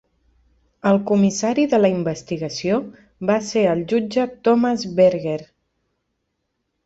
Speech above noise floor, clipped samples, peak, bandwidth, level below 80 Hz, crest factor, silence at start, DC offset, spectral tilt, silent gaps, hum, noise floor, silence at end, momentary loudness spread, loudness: 56 dB; under 0.1%; -4 dBFS; 8 kHz; -58 dBFS; 16 dB; 0.85 s; under 0.1%; -6 dB/octave; none; none; -74 dBFS; 1.4 s; 10 LU; -20 LUFS